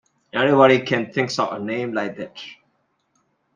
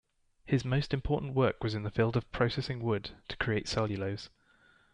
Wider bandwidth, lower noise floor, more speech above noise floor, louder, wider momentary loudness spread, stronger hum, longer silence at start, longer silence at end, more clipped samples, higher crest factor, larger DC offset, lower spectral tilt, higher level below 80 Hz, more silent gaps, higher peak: about the same, 9.4 kHz vs 10 kHz; about the same, -68 dBFS vs -65 dBFS; first, 48 dB vs 33 dB; first, -20 LUFS vs -32 LUFS; first, 19 LU vs 6 LU; neither; about the same, 0.35 s vs 0.45 s; first, 1 s vs 0.65 s; neither; about the same, 20 dB vs 18 dB; neither; about the same, -5.5 dB/octave vs -6.5 dB/octave; second, -66 dBFS vs -50 dBFS; neither; first, -2 dBFS vs -14 dBFS